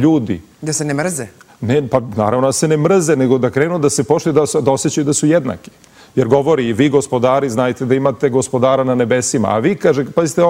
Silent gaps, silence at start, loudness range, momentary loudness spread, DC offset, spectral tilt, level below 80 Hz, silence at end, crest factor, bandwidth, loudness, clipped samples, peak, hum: none; 0 s; 1 LU; 7 LU; under 0.1%; -5.5 dB/octave; -52 dBFS; 0 s; 14 dB; 16 kHz; -15 LUFS; under 0.1%; 0 dBFS; none